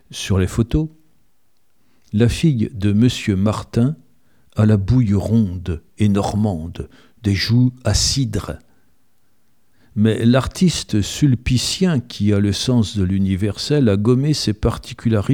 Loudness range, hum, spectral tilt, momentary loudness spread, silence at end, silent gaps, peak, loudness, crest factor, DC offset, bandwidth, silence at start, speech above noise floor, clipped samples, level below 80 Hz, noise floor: 3 LU; none; -6 dB/octave; 10 LU; 0 s; none; -2 dBFS; -18 LUFS; 16 dB; 0.3%; 16 kHz; 0.1 s; 50 dB; under 0.1%; -36 dBFS; -67 dBFS